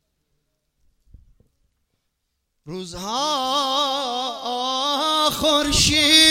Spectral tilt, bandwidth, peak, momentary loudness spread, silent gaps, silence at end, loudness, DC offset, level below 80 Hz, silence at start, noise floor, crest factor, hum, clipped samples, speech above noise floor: -2 dB/octave; 16.5 kHz; 0 dBFS; 15 LU; none; 0 s; -19 LUFS; under 0.1%; -42 dBFS; 2.65 s; -75 dBFS; 22 dB; none; under 0.1%; 56 dB